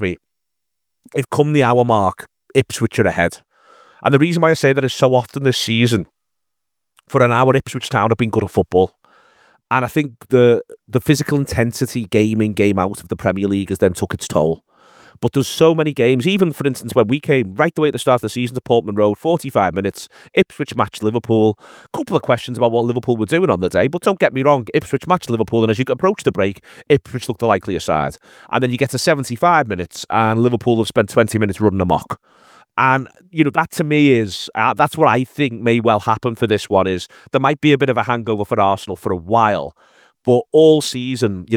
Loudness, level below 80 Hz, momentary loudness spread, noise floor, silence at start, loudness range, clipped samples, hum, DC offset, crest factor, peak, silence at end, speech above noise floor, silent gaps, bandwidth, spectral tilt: -17 LUFS; -50 dBFS; 8 LU; -81 dBFS; 0 s; 2 LU; under 0.1%; none; under 0.1%; 16 dB; 0 dBFS; 0 s; 65 dB; none; 18 kHz; -6 dB/octave